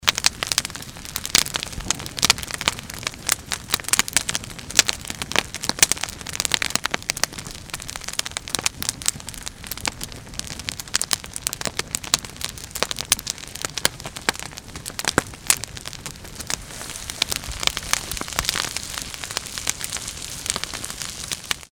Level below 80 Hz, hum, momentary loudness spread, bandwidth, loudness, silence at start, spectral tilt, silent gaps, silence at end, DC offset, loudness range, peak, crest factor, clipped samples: -44 dBFS; none; 13 LU; over 20 kHz; -24 LUFS; 0 s; -0.5 dB/octave; none; 0.05 s; under 0.1%; 5 LU; 0 dBFS; 26 dB; under 0.1%